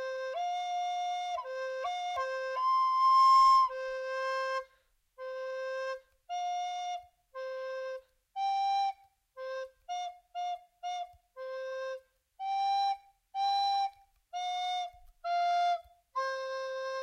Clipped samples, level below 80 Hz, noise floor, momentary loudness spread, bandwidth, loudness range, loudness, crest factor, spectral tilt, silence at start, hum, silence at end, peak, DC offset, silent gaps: under 0.1%; -72 dBFS; -71 dBFS; 17 LU; 11.5 kHz; 11 LU; -32 LUFS; 16 dB; 2 dB/octave; 0 s; none; 0 s; -16 dBFS; under 0.1%; none